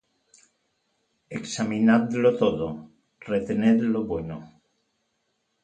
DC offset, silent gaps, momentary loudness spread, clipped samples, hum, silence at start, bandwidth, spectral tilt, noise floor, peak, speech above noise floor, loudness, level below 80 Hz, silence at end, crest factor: under 0.1%; none; 17 LU; under 0.1%; none; 1.3 s; 9.2 kHz; -6 dB/octave; -75 dBFS; -6 dBFS; 51 dB; -24 LUFS; -56 dBFS; 1.15 s; 20 dB